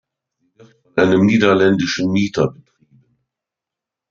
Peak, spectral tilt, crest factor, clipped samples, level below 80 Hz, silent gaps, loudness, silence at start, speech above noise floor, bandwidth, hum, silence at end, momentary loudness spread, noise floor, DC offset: -2 dBFS; -6 dB/octave; 16 dB; under 0.1%; -56 dBFS; none; -16 LUFS; 0.95 s; 71 dB; 7.4 kHz; none; 1.6 s; 8 LU; -85 dBFS; under 0.1%